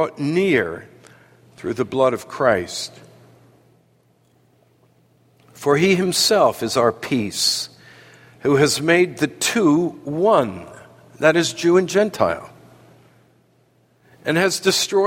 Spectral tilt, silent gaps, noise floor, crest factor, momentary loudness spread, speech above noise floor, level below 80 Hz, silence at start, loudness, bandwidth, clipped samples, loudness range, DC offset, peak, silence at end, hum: -4 dB/octave; none; -59 dBFS; 20 dB; 12 LU; 41 dB; -60 dBFS; 0 s; -19 LUFS; 16.5 kHz; under 0.1%; 6 LU; under 0.1%; -2 dBFS; 0 s; none